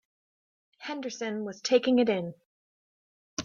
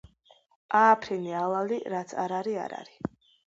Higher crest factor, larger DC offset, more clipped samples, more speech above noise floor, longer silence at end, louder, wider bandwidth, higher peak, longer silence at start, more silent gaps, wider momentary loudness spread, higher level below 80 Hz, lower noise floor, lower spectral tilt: about the same, 22 dB vs 20 dB; neither; neither; first, over 62 dB vs 35 dB; second, 0 s vs 0.45 s; about the same, -28 LUFS vs -27 LUFS; about the same, 7.4 kHz vs 7.8 kHz; about the same, -10 dBFS vs -8 dBFS; about the same, 0.8 s vs 0.7 s; first, 2.46-3.37 s vs none; about the same, 16 LU vs 17 LU; second, -74 dBFS vs -66 dBFS; first, under -90 dBFS vs -62 dBFS; about the same, -4.5 dB/octave vs -5.5 dB/octave